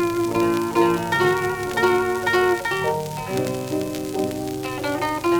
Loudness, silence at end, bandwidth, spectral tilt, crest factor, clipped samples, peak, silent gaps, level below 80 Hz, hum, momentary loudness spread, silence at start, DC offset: -22 LUFS; 0 s; over 20 kHz; -5 dB/octave; 16 dB; under 0.1%; -6 dBFS; none; -50 dBFS; none; 7 LU; 0 s; under 0.1%